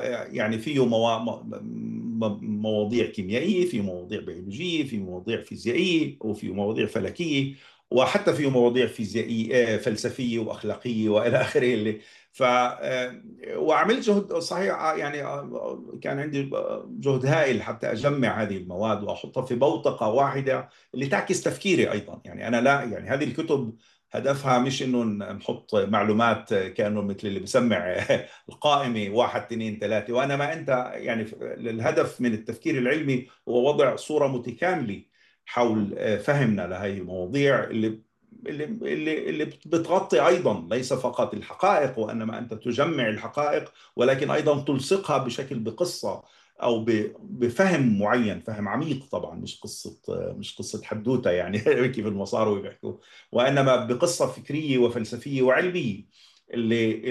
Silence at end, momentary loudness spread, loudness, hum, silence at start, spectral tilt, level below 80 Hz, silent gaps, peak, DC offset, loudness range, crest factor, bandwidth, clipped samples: 0 s; 11 LU; -25 LUFS; none; 0 s; -5.5 dB/octave; -70 dBFS; none; -8 dBFS; under 0.1%; 3 LU; 18 dB; 12.5 kHz; under 0.1%